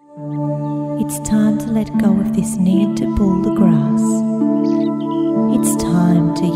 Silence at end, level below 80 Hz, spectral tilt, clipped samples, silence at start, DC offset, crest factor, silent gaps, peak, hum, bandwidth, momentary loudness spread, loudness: 0 s; -38 dBFS; -7 dB/octave; under 0.1%; 0.1 s; under 0.1%; 14 dB; none; -2 dBFS; none; 15.5 kHz; 7 LU; -16 LUFS